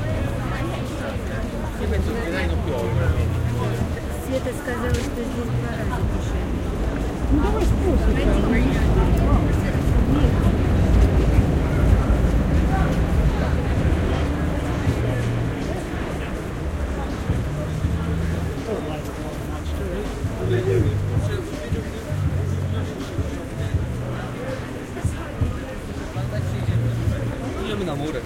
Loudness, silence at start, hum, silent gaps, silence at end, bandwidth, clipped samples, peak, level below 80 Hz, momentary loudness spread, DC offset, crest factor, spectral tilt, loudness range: -23 LUFS; 0 s; none; none; 0 s; 16 kHz; under 0.1%; -4 dBFS; -26 dBFS; 9 LU; under 0.1%; 18 dB; -7 dB/octave; 7 LU